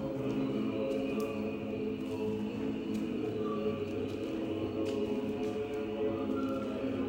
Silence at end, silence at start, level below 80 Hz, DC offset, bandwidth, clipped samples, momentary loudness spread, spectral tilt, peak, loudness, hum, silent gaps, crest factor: 0 s; 0 s; -60 dBFS; under 0.1%; 16 kHz; under 0.1%; 3 LU; -7.5 dB/octave; -22 dBFS; -35 LUFS; none; none; 12 dB